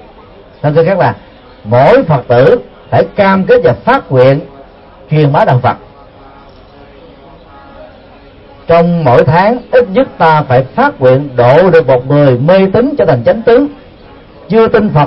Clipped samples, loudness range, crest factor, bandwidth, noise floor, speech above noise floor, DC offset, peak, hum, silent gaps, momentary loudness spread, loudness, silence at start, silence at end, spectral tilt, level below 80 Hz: 0.4%; 7 LU; 10 dB; 5.8 kHz; -36 dBFS; 29 dB; under 0.1%; 0 dBFS; none; none; 7 LU; -8 LUFS; 0.65 s; 0 s; -9.5 dB/octave; -38 dBFS